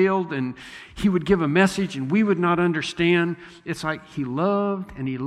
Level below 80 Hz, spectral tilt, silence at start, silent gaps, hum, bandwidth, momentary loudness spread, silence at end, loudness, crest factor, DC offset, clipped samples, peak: -50 dBFS; -6.5 dB/octave; 0 s; none; none; 12.5 kHz; 10 LU; 0 s; -23 LUFS; 18 dB; under 0.1%; under 0.1%; -4 dBFS